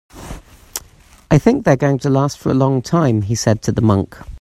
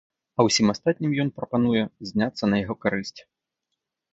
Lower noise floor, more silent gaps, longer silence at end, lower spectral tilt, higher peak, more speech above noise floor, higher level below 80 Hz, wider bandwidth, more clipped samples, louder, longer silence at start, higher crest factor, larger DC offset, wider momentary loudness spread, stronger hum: second, -45 dBFS vs -82 dBFS; neither; second, 0.05 s vs 0.9 s; first, -6.5 dB/octave vs -5 dB/octave; first, 0 dBFS vs -6 dBFS; second, 31 dB vs 59 dB; first, -40 dBFS vs -56 dBFS; first, 15 kHz vs 8 kHz; neither; first, -16 LUFS vs -24 LUFS; second, 0.15 s vs 0.4 s; about the same, 16 dB vs 20 dB; neither; first, 16 LU vs 8 LU; neither